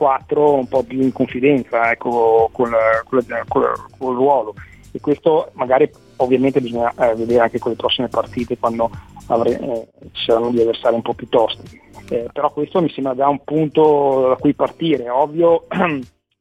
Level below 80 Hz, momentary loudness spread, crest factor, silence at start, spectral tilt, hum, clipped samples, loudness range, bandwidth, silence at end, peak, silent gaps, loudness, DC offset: -50 dBFS; 9 LU; 16 dB; 0 s; -7 dB/octave; none; under 0.1%; 3 LU; 9.8 kHz; 0.35 s; -2 dBFS; none; -17 LUFS; under 0.1%